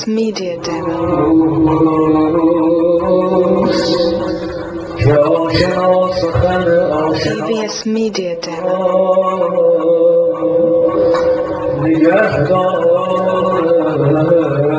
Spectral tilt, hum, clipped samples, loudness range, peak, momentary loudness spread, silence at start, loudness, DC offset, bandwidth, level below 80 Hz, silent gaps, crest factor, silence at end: -6.5 dB/octave; none; under 0.1%; 2 LU; 0 dBFS; 7 LU; 0 s; -13 LUFS; under 0.1%; 8 kHz; -38 dBFS; none; 12 dB; 0 s